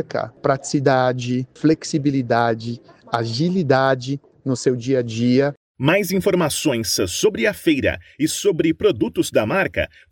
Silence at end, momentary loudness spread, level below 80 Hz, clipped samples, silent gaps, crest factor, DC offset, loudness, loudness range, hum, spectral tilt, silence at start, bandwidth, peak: 0.25 s; 7 LU; -50 dBFS; under 0.1%; 5.57-5.75 s; 16 dB; under 0.1%; -20 LUFS; 1 LU; none; -5 dB/octave; 0 s; 17 kHz; -2 dBFS